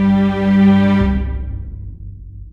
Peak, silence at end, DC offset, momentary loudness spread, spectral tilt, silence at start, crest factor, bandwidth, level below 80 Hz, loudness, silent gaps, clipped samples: -2 dBFS; 0 s; under 0.1%; 23 LU; -9 dB/octave; 0 s; 12 dB; 5.4 kHz; -26 dBFS; -14 LUFS; none; under 0.1%